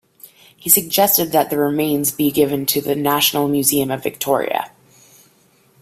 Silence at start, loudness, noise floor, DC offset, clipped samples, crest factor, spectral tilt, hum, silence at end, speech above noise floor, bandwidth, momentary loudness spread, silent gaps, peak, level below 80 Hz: 0.65 s; -16 LUFS; -55 dBFS; under 0.1%; under 0.1%; 18 dB; -3 dB/octave; none; 1.15 s; 38 dB; 16 kHz; 9 LU; none; 0 dBFS; -58 dBFS